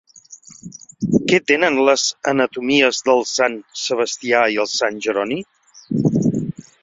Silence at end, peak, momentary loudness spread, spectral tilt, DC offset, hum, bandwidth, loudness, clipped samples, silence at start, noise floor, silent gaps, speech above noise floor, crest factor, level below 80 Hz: 0.2 s; 0 dBFS; 12 LU; -4 dB/octave; under 0.1%; none; 8 kHz; -18 LUFS; under 0.1%; 0.3 s; -44 dBFS; none; 26 dB; 18 dB; -56 dBFS